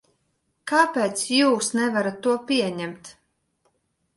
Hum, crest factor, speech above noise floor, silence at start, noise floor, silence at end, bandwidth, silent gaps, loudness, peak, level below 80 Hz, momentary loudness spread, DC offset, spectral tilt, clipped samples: none; 18 dB; 50 dB; 0.65 s; -72 dBFS; 1.05 s; 12 kHz; none; -22 LUFS; -6 dBFS; -70 dBFS; 14 LU; under 0.1%; -3 dB/octave; under 0.1%